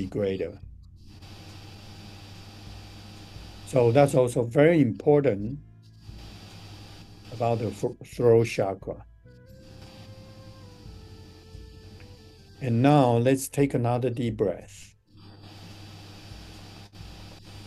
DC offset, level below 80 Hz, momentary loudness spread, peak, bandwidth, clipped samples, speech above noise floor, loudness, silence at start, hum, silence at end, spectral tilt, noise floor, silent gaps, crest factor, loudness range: under 0.1%; -52 dBFS; 27 LU; -6 dBFS; 12.5 kHz; under 0.1%; 28 dB; -24 LUFS; 0 s; none; 0 s; -7 dB/octave; -51 dBFS; none; 22 dB; 19 LU